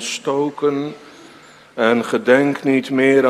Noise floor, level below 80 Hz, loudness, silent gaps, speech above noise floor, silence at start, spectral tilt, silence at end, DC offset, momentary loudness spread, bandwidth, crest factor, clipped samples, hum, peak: -44 dBFS; -70 dBFS; -17 LUFS; none; 28 dB; 0 s; -5 dB/octave; 0 s; under 0.1%; 13 LU; 13.5 kHz; 18 dB; under 0.1%; none; 0 dBFS